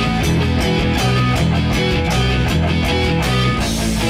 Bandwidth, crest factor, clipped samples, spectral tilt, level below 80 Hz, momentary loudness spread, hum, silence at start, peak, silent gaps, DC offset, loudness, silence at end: 16 kHz; 12 dB; under 0.1%; -5.5 dB/octave; -24 dBFS; 1 LU; none; 0 s; -4 dBFS; none; under 0.1%; -16 LUFS; 0 s